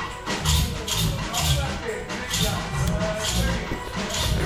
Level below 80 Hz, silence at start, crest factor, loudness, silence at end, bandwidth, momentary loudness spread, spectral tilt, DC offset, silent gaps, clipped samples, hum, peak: -32 dBFS; 0 s; 16 dB; -25 LUFS; 0 s; 17 kHz; 7 LU; -3.5 dB/octave; under 0.1%; none; under 0.1%; none; -8 dBFS